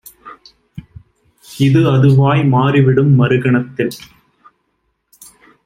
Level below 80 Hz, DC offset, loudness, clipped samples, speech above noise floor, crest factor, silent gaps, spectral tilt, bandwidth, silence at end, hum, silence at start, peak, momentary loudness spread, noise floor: -50 dBFS; under 0.1%; -12 LUFS; under 0.1%; 55 dB; 14 dB; none; -8 dB/octave; 15 kHz; 1.7 s; none; 0.25 s; -2 dBFS; 10 LU; -67 dBFS